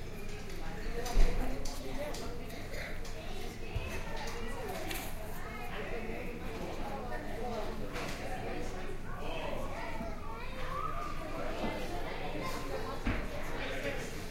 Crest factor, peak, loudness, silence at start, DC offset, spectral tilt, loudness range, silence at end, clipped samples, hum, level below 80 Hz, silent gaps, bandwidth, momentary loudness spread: 22 dB; -12 dBFS; -40 LUFS; 0 s; under 0.1%; -5 dB/octave; 2 LU; 0 s; under 0.1%; none; -38 dBFS; none; 16 kHz; 6 LU